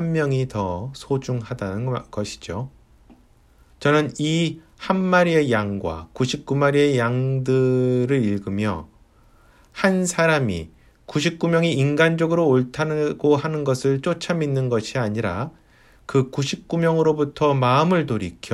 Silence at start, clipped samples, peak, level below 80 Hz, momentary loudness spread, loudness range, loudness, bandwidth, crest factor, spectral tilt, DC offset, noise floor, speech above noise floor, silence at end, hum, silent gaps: 0 s; under 0.1%; -4 dBFS; -52 dBFS; 11 LU; 5 LU; -21 LUFS; 12.5 kHz; 16 dB; -6 dB/octave; under 0.1%; -54 dBFS; 33 dB; 0 s; none; none